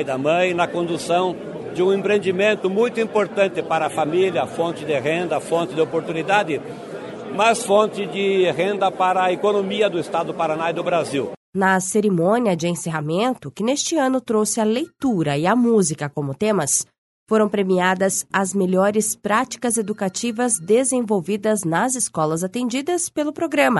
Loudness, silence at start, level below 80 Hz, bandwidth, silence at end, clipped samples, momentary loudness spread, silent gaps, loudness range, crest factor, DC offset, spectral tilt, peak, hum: -20 LUFS; 0 s; -64 dBFS; 12 kHz; 0 s; under 0.1%; 6 LU; 11.37-11.53 s, 16.98-17.26 s; 1 LU; 18 dB; under 0.1%; -4 dB/octave; -2 dBFS; none